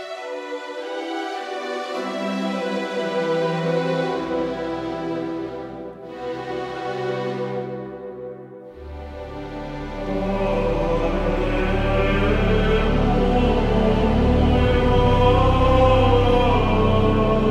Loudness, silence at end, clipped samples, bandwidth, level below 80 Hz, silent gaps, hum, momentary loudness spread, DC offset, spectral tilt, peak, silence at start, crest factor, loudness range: -21 LUFS; 0 s; under 0.1%; 9 kHz; -28 dBFS; none; none; 16 LU; under 0.1%; -7.5 dB/octave; -4 dBFS; 0 s; 16 dB; 12 LU